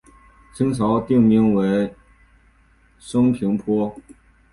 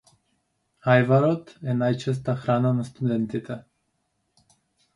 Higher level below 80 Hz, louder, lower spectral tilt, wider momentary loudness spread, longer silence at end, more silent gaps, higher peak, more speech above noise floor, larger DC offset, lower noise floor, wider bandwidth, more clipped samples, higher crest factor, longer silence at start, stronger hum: first, -50 dBFS vs -62 dBFS; first, -19 LUFS vs -24 LUFS; about the same, -8 dB/octave vs -8 dB/octave; second, 9 LU vs 12 LU; second, 0.5 s vs 1.35 s; neither; about the same, -4 dBFS vs -4 dBFS; second, 37 dB vs 51 dB; neither; second, -56 dBFS vs -74 dBFS; about the same, 11.5 kHz vs 11 kHz; neither; about the same, 16 dB vs 20 dB; second, 0.55 s vs 0.85 s; neither